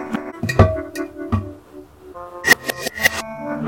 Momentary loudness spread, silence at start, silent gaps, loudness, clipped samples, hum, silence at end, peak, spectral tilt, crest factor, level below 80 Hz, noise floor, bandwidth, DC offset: 20 LU; 0 s; none; -19 LUFS; under 0.1%; none; 0 s; 0 dBFS; -4.5 dB/octave; 20 dB; -34 dBFS; -41 dBFS; 17 kHz; 0.1%